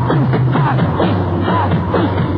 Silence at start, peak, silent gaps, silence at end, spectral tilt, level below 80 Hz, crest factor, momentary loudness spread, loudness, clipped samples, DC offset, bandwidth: 0 s; -2 dBFS; none; 0 s; -10.5 dB/octave; -36 dBFS; 12 dB; 2 LU; -15 LUFS; under 0.1%; under 0.1%; 5 kHz